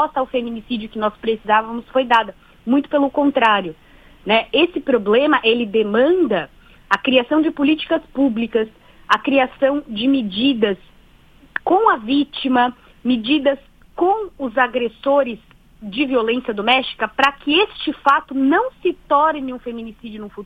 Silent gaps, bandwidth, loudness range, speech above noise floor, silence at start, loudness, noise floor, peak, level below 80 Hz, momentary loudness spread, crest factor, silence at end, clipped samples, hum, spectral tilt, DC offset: none; 7.8 kHz; 3 LU; 31 dB; 0 s; -18 LUFS; -49 dBFS; 0 dBFS; -50 dBFS; 12 LU; 18 dB; 0 s; under 0.1%; none; -5.5 dB/octave; under 0.1%